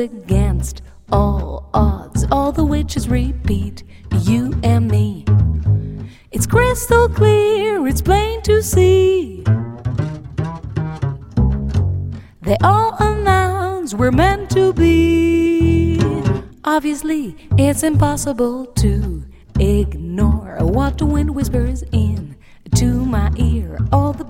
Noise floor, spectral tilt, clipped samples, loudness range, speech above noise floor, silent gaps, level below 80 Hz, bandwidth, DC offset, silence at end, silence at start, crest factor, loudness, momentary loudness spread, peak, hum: -36 dBFS; -6.5 dB/octave; under 0.1%; 4 LU; 21 dB; none; -24 dBFS; 16.5 kHz; under 0.1%; 0 s; 0 s; 16 dB; -17 LUFS; 10 LU; 0 dBFS; none